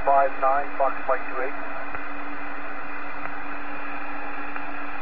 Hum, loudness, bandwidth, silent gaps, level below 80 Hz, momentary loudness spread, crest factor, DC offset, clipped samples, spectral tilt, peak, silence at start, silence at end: none; -28 LUFS; 5.6 kHz; none; -54 dBFS; 11 LU; 20 dB; 7%; under 0.1%; -3.5 dB/octave; -8 dBFS; 0 s; 0 s